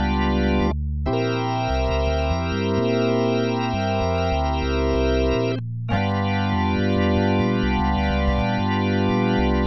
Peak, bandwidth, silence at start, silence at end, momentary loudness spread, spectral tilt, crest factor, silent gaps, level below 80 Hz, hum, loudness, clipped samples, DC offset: -10 dBFS; 6 kHz; 0 s; 0 s; 3 LU; -7.5 dB/octave; 12 dB; none; -28 dBFS; none; -22 LUFS; under 0.1%; 0.7%